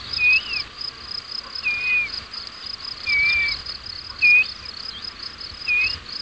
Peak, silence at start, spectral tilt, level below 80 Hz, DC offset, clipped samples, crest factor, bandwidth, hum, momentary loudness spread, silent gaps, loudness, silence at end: -8 dBFS; 0 s; -1 dB/octave; -48 dBFS; under 0.1%; under 0.1%; 16 dB; 8 kHz; none; 16 LU; none; -20 LUFS; 0 s